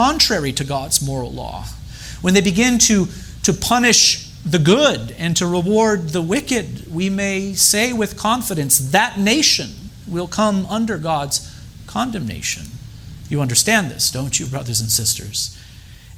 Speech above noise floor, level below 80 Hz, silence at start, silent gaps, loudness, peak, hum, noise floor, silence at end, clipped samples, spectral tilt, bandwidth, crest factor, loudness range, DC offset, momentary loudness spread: 22 dB; -40 dBFS; 0 s; none; -17 LUFS; 0 dBFS; none; -40 dBFS; 0 s; under 0.1%; -3 dB/octave; over 20 kHz; 18 dB; 5 LU; under 0.1%; 15 LU